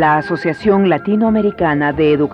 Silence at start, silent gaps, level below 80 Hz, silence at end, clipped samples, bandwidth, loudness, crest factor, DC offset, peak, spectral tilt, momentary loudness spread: 0 s; none; -42 dBFS; 0 s; under 0.1%; 7.8 kHz; -14 LUFS; 12 dB; under 0.1%; -2 dBFS; -8.5 dB/octave; 2 LU